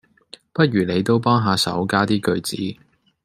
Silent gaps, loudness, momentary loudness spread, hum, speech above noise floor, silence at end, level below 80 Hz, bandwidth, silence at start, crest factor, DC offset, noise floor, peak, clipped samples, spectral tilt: none; -20 LUFS; 10 LU; none; 28 dB; 0.5 s; -58 dBFS; 15.5 kHz; 0.55 s; 18 dB; under 0.1%; -47 dBFS; -2 dBFS; under 0.1%; -5.5 dB/octave